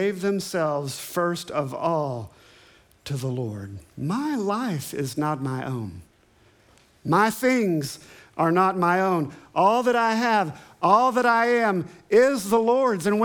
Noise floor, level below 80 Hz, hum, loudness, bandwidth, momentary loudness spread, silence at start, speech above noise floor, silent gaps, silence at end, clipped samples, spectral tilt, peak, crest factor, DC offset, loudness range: -58 dBFS; -64 dBFS; none; -23 LUFS; 19.5 kHz; 14 LU; 0 s; 36 dB; none; 0 s; under 0.1%; -5.5 dB/octave; -4 dBFS; 20 dB; under 0.1%; 8 LU